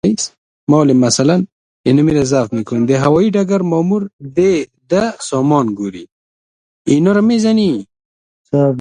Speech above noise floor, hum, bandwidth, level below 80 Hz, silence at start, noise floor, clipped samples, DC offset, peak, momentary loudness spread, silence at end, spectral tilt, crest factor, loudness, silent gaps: over 77 dB; none; 10.5 kHz; -48 dBFS; 0.05 s; under -90 dBFS; under 0.1%; under 0.1%; 0 dBFS; 11 LU; 0 s; -6 dB/octave; 14 dB; -14 LUFS; 0.38-0.67 s, 1.52-1.84 s, 4.13-4.19 s, 6.12-6.85 s, 8.05-8.45 s